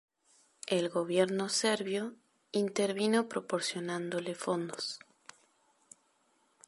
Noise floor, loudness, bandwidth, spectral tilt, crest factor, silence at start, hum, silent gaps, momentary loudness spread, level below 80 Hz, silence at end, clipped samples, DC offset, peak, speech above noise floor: -72 dBFS; -33 LUFS; 11.5 kHz; -4 dB/octave; 20 dB; 0.65 s; none; none; 8 LU; -84 dBFS; 1.7 s; under 0.1%; under 0.1%; -14 dBFS; 40 dB